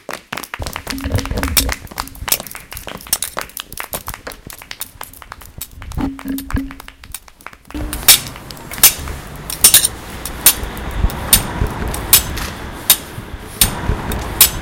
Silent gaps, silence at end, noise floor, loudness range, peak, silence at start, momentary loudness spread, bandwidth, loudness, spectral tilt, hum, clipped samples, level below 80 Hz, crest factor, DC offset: none; 0 s; -39 dBFS; 15 LU; 0 dBFS; 0.1 s; 21 LU; 17.5 kHz; -14 LUFS; -1.5 dB/octave; none; 0.3%; -28 dBFS; 18 dB; under 0.1%